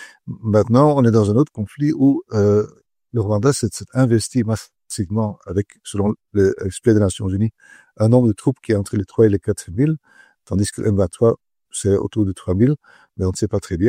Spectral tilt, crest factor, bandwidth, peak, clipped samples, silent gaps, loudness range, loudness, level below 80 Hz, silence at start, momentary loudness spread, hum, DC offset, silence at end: -7 dB/octave; 18 dB; 15 kHz; 0 dBFS; under 0.1%; none; 3 LU; -19 LUFS; -46 dBFS; 0 s; 10 LU; none; under 0.1%; 0 s